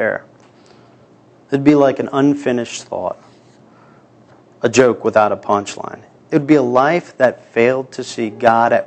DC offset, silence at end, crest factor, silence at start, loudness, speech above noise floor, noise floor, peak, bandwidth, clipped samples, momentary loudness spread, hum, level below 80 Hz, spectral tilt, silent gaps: under 0.1%; 0 s; 16 dB; 0 s; -16 LUFS; 33 dB; -48 dBFS; 0 dBFS; 8.8 kHz; under 0.1%; 13 LU; none; -60 dBFS; -5.5 dB/octave; none